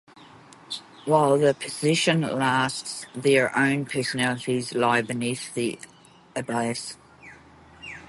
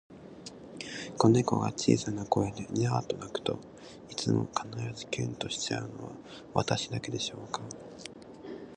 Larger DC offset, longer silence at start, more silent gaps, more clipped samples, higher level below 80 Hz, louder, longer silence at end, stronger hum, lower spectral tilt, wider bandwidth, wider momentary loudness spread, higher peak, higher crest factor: neither; about the same, 0.2 s vs 0.1 s; neither; neither; about the same, -64 dBFS vs -60 dBFS; first, -24 LUFS vs -31 LUFS; about the same, 0.05 s vs 0 s; neither; about the same, -4.5 dB/octave vs -5 dB/octave; first, 12 kHz vs 10.5 kHz; about the same, 16 LU vs 18 LU; about the same, -6 dBFS vs -8 dBFS; about the same, 20 dB vs 24 dB